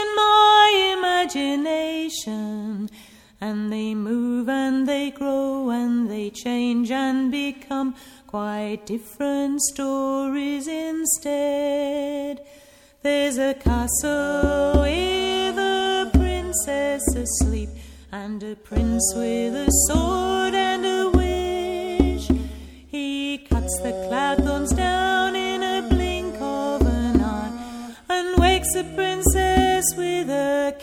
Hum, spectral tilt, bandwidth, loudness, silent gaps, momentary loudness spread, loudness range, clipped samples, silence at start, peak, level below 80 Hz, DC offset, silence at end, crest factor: none; -4 dB/octave; 17 kHz; -22 LUFS; none; 11 LU; 5 LU; under 0.1%; 0 s; -2 dBFS; -32 dBFS; under 0.1%; 0 s; 20 dB